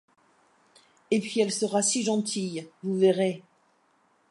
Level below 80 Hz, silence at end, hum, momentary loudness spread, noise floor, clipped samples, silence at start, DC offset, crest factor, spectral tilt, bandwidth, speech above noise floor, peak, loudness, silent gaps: -78 dBFS; 0.9 s; none; 10 LU; -67 dBFS; under 0.1%; 1.1 s; under 0.1%; 18 dB; -4 dB/octave; 11.5 kHz; 41 dB; -10 dBFS; -26 LUFS; none